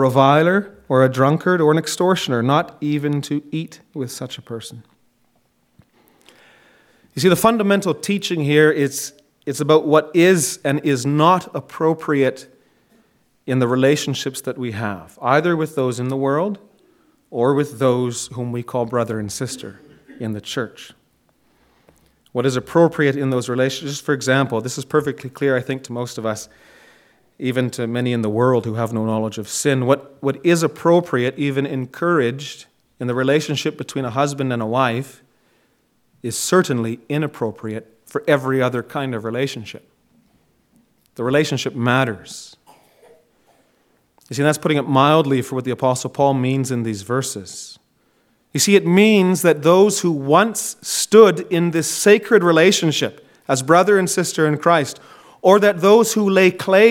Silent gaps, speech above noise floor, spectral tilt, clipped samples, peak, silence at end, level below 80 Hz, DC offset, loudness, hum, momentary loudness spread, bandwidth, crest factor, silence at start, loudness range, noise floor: none; 45 dB; -5 dB/octave; under 0.1%; 0 dBFS; 0 s; -64 dBFS; under 0.1%; -18 LUFS; none; 15 LU; 17 kHz; 18 dB; 0 s; 9 LU; -62 dBFS